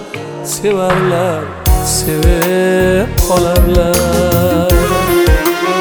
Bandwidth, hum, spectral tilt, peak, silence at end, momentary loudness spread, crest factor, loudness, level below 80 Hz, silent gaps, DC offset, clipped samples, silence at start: over 20 kHz; none; -5 dB/octave; 0 dBFS; 0 s; 5 LU; 12 dB; -12 LUFS; -18 dBFS; none; under 0.1%; under 0.1%; 0 s